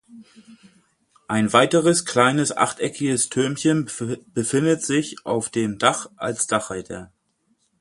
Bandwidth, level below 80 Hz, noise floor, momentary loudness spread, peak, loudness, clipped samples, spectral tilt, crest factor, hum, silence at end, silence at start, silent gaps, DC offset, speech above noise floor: 11.5 kHz; -60 dBFS; -68 dBFS; 11 LU; 0 dBFS; -21 LUFS; under 0.1%; -4 dB/octave; 22 dB; none; 0.75 s; 0.1 s; none; under 0.1%; 46 dB